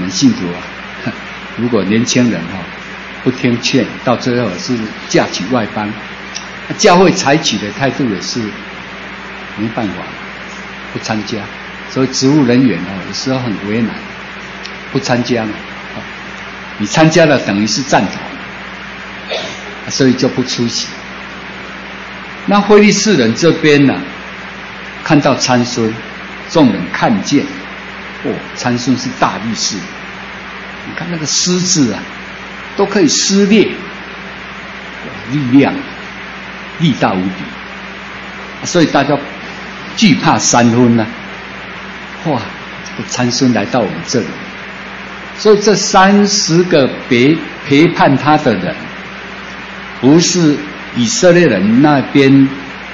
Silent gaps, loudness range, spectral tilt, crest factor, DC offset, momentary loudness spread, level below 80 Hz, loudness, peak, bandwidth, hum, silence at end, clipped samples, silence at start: none; 6 LU; -4.5 dB/octave; 14 dB; under 0.1%; 17 LU; -44 dBFS; -12 LUFS; 0 dBFS; 8 kHz; none; 0 s; 0.1%; 0 s